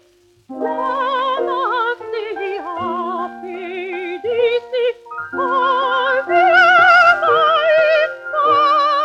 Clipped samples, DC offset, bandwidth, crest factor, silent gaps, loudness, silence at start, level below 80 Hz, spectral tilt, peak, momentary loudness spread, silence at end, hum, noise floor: under 0.1%; under 0.1%; 8.8 kHz; 14 dB; none; -15 LUFS; 0.5 s; -64 dBFS; -3.5 dB/octave; -2 dBFS; 15 LU; 0 s; none; -52 dBFS